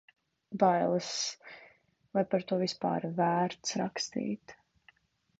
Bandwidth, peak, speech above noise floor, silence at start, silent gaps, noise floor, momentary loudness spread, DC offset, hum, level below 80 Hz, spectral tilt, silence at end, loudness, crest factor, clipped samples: 8 kHz; -12 dBFS; 35 dB; 0.5 s; none; -66 dBFS; 15 LU; under 0.1%; none; -74 dBFS; -4.5 dB/octave; 0.85 s; -32 LUFS; 20 dB; under 0.1%